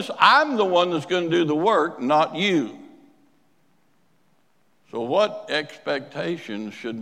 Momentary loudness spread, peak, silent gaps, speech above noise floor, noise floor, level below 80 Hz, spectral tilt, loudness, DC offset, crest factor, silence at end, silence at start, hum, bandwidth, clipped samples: 15 LU; 0 dBFS; none; 45 dB; -66 dBFS; -80 dBFS; -5 dB/octave; -22 LUFS; under 0.1%; 22 dB; 0 s; 0 s; none; 12.5 kHz; under 0.1%